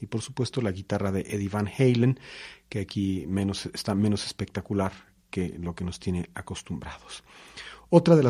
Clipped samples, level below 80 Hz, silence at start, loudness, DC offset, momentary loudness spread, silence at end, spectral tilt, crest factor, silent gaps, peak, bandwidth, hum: under 0.1%; -54 dBFS; 0 s; -28 LUFS; under 0.1%; 19 LU; 0 s; -6.5 dB/octave; 24 dB; none; -4 dBFS; 14.5 kHz; none